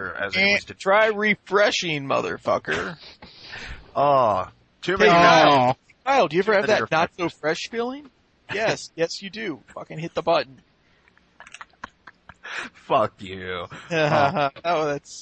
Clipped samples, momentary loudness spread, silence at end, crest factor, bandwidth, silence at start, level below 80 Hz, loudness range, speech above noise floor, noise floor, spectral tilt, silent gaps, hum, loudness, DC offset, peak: under 0.1%; 19 LU; 0 s; 20 dB; 8.8 kHz; 0 s; -56 dBFS; 12 LU; 38 dB; -60 dBFS; -4.5 dB/octave; none; none; -21 LUFS; under 0.1%; -4 dBFS